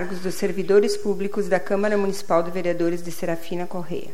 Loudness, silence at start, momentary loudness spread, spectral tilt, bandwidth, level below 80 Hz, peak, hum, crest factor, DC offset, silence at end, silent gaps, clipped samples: -24 LUFS; 0 s; 10 LU; -5.5 dB/octave; 16 kHz; -60 dBFS; -4 dBFS; none; 18 dB; 5%; 0 s; none; under 0.1%